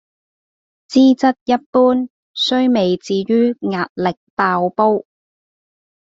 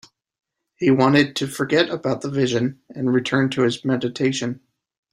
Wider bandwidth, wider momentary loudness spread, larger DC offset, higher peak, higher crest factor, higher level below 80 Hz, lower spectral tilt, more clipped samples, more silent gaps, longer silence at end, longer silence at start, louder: second, 7.8 kHz vs 13.5 kHz; about the same, 8 LU vs 10 LU; neither; about the same, 0 dBFS vs -2 dBFS; about the same, 16 dB vs 18 dB; about the same, -60 dBFS vs -60 dBFS; about the same, -6 dB/octave vs -5.5 dB/octave; neither; first, 1.41-1.46 s, 1.66-1.73 s, 2.10-2.34 s, 3.90-3.96 s, 4.17-4.37 s vs none; first, 1 s vs 0.55 s; about the same, 0.9 s vs 0.8 s; first, -16 LUFS vs -21 LUFS